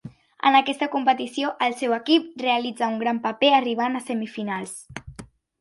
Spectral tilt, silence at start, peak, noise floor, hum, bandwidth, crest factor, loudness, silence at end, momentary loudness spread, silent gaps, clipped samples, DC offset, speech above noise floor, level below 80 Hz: -4 dB/octave; 0.05 s; -4 dBFS; -45 dBFS; none; 11.5 kHz; 20 dB; -23 LUFS; 0.35 s; 13 LU; none; under 0.1%; under 0.1%; 22 dB; -58 dBFS